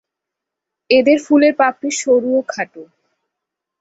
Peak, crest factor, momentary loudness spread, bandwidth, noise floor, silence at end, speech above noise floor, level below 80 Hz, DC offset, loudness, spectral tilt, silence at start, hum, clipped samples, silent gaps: 0 dBFS; 16 dB; 13 LU; 8 kHz; -82 dBFS; 0.95 s; 68 dB; -64 dBFS; under 0.1%; -15 LUFS; -3 dB/octave; 0.9 s; none; under 0.1%; none